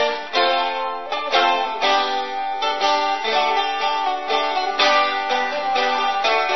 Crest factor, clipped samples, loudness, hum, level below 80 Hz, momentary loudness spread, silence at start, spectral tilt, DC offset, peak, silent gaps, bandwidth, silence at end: 16 dB; under 0.1%; -19 LUFS; none; -72 dBFS; 6 LU; 0 s; -1 dB/octave; 1%; -4 dBFS; none; 6.4 kHz; 0 s